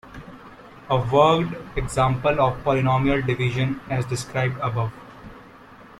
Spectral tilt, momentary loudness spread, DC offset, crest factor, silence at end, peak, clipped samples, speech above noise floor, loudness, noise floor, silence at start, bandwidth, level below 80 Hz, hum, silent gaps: -6.5 dB/octave; 23 LU; under 0.1%; 20 dB; 0.05 s; -4 dBFS; under 0.1%; 24 dB; -22 LUFS; -46 dBFS; 0.05 s; 12.5 kHz; -42 dBFS; none; none